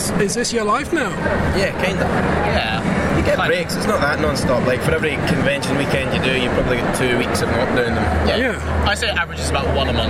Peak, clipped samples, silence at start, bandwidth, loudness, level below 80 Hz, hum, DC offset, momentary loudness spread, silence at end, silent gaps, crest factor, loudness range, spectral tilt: -2 dBFS; under 0.1%; 0 s; 16 kHz; -18 LUFS; -30 dBFS; none; under 0.1%; 2 LU; 0 s; none; 16 dB; 0 LU; -5 dB/octave